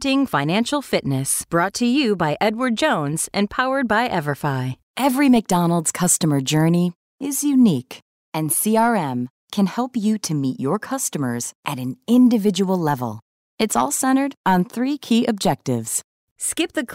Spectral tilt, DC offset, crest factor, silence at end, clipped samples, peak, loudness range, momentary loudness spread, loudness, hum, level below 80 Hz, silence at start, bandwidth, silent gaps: -4.5 dB/octave; under 0.1%; 14 dB; 0 s; under 0.1%; -6 dBFS; 2 LU; 10 LU; -20 LUFS; none; -56 dBFS; 0 s; 16 kHz; 4.83-4.94 s, 6.96-7.18 s, 8.02-8.32 s, 9.30-9.48 s, 11.55-11.63 s, 13.22-13.58 s, 14.37-14.44 s, 16.04-16.36 s